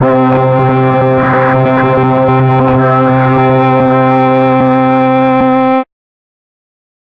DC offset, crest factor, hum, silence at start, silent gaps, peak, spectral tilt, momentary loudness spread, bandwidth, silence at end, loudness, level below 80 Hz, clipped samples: under 0.1%; 8 dB; none; 0 s; none; 0 dBFS; -10 dB/octave; 1 LU; 5 kHz; 1.25 s; -9 LUFS; -40 dBFS; under 0.1%